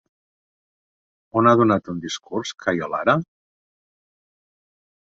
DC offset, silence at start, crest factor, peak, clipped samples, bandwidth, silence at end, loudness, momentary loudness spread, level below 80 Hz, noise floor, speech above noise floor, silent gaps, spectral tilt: under 0.1%; 1.35 s; 22 dB; -2 dBFS; under 0.1%; 7.8 kHz; 1.9 s; -21 LUFS; 13 LU; -60 dBFS; under -90 dBFS; over 70 dB; none; -6 dB/octave